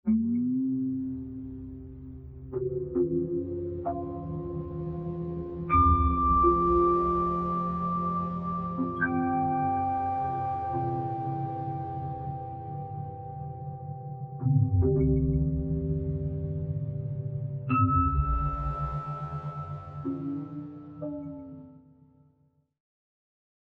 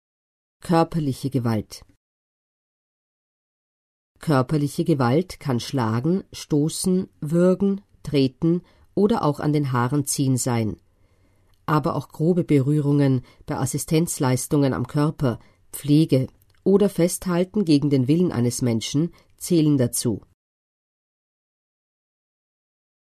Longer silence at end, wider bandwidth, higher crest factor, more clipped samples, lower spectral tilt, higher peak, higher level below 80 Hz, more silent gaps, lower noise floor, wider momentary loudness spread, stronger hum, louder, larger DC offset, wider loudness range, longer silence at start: second, 1.85 s vs 2.95 s; second, 4.2 kHz vs 13.5 kHz; about the same, 18 dB vs 18 dB; neither; first, -11.5 dB/octave vs -6.5 dB/octave; second, -12 dBFS vs -6 dBFS; first, -40 dBFS vs -52 dBFS; second, none vs 1.97-4.15 s; first, -68 dBFS vs -59 dBFS; first, 15 LU vs 9 LU; neither; second, -29 LUFS vs -22 LUFS; neither; first, 11 LU vs 6 LU; second, 0.05 s vs 0.65 s